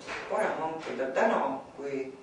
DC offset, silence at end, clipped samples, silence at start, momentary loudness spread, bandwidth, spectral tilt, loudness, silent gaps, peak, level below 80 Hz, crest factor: under 0.1%; 0 s; under 0.1%; 0 s; 9 LU; 10.5 kHz; -4.5 dB/octave; -31 LUFS; none; -14 dBFS; -70 dBFS; 18 dB